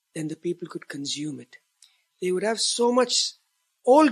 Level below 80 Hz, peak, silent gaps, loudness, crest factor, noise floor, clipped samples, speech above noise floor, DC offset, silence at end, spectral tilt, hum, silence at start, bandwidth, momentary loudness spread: -82 dBFS; -6 dBFS; none; -25 LUFS; 18 dB; -61 dBFS; under 0.1%; 35 dB; under 0.1%; 0 s; -3 dB/octave; none; 0.15 s; 13 kHz; 15 LU